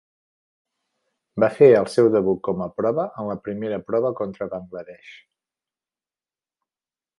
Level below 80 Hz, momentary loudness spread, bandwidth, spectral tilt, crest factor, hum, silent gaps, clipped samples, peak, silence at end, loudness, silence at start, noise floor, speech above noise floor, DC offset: -62 dBFS; 19 LU; 11.5 kHz; -7.5 dB/octave; 20 dB; none; none; under 0.1%; -2 dBFS; 2.05 s; -21 LUFS; 1.35 s; under -90 dBFS; over 69 dB; under 0.1%